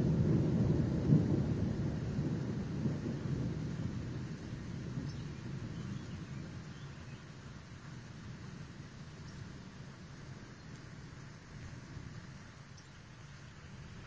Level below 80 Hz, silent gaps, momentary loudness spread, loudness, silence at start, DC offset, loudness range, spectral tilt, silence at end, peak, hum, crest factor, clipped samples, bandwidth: -52 dBFS; none; 20 LU; -38 LUFS; 0 s; under 0.1%; 16 LU; -8 dB/octave; 0 s; -14 dBFS; none; 24 dB; under 0.1%; 8 kHz